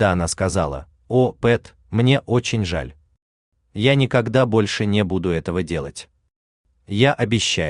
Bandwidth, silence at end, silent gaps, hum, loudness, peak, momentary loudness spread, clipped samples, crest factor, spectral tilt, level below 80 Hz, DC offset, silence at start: 11 kHz; 0 s; 3.22-3.52 s, 6.36-6.64 s; none; -20 LUFS; -4 dBFS; 11 LU; under 0.1%; 18 dB; -5.5 dB/octave; -44 dBFS; under 0.1%; 0 s